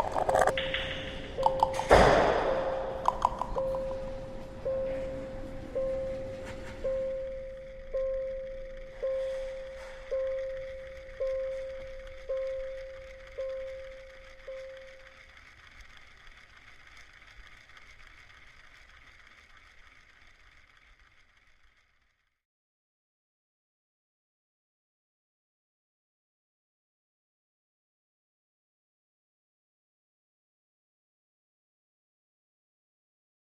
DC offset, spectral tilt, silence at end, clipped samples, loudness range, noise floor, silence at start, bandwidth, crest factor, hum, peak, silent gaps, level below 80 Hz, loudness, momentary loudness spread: under 0.1%; -5 dB/octave; 12.5 s; under 0.1%; 26 LU; -73 dBFS; 0 s; 13.5 kHz; 28 dB; none; -6 dBFS; none; -48 dBFS; -32 LUFS; 25 LU